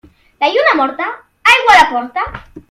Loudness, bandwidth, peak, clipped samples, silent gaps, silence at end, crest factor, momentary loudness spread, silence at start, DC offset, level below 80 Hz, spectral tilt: -11 LUFS; 16.5 kHz; 0 dBFS; 0.3%; none; 0.1 s; 14 dB; 15 LU; 0.4 s; under 0.1%; -44 dBFS; -2 dB/octave